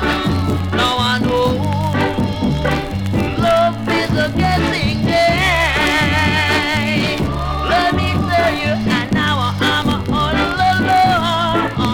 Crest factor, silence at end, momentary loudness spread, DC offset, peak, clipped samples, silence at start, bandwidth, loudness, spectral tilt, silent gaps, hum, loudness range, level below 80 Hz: 12 dB; 0 s; 5 LU; under 0.1%; -2 dBFS; under 0.1%; 0 s; 19 kHz; -16 LUFS; -5.5 dB/octave; none; none; 2 LU; -30 dBFS